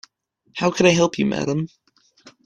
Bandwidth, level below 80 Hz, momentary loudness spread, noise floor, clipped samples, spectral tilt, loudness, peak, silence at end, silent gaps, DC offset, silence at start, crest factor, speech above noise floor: 11 kHz; -56 dBFS; 15 LU; -64 dBFS; under 0.1%; -5 dB/octave; -20 LUFS; -2 dBFS; 0.15 s; none; under 0.1%; 0.55 s; 20 dB; 45 dB